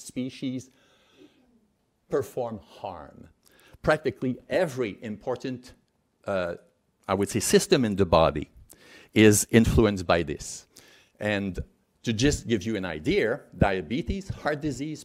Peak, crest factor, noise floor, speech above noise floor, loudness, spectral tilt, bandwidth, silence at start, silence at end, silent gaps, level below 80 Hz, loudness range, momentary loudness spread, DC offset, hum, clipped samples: -4 dBFS; 24 dB; -70 dBFS; 44 dB; -26 LUFS; -5 dB/octave; 16 kHz; 0 s; 0 s; none; -44 dBFS; 10 LU; 18 LU; under 0.1%; none; under 0.1%